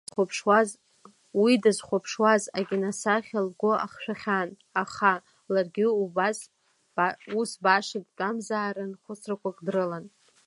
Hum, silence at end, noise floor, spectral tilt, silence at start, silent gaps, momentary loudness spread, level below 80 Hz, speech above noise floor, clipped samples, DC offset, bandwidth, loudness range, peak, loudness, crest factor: none; 0.4 s; -57 dBFS; -4.5 dB/octave; 0.15 s; none; 11 LU; -76 dBFS; 31 dB; under 0.1%; under 0.1%; 11.5 kHz; 4 LU; -8 dBFS; -27 LUFS; 20 dB